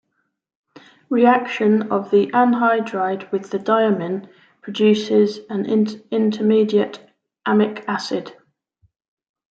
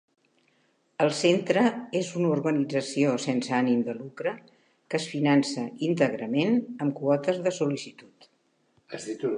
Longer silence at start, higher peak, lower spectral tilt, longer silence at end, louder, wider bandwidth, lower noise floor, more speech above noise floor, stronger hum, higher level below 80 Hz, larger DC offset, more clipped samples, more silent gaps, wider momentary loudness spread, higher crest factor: about the same, 1.1 s vs 1 s; first, -2 dBFS vs -8 dBFS; about the same, -6.5 dB/octave vs -5.5 dB/octave; first, 1.25 s vs 0 s; first, -19 LUFS vs -26 LUFS; second, 7.8 kHz vs 10.5 kHz; about the same, -72 dBFS vs -69 dBFS; first, 54 dB vs 43 dB; neither; first, -70 dBFS vs -80 dBFS; neither; neither; neither; about the same, 11 LU vs 10 LU; about the same, 18 dB vs 18 dB